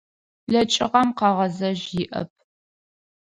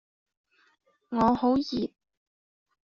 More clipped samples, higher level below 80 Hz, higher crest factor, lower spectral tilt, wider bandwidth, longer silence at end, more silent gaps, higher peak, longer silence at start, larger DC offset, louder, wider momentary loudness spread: neither; about the same, -58 dBFS vs -58 dBFS; about the same, 20 dB vs 20 dB; about the same, -4.5 dB/octave vs -5 dB/octave; first, 10.5 kHz vs 7.2 kHz; about the same, 1 s vs 1 s; neither; first, -4 dBFS vs -10 dBFS; second, 0.5 s vs 1.1 s; neither; first, -22 LUFS vs -27 LUFS; about the same, 13 LU vs 11 LU